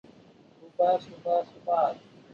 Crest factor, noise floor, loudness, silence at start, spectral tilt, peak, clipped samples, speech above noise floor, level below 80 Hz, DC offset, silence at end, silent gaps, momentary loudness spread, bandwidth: 16 dB; -56 dBFS; -28 LUFS; 0.65 s; -6.5 dB/octave; -14 dBFS; under 0.1%; 29 dB; -74 dBFS; under 0.1%; 0.35 s; none; 11 LU; 7 kHz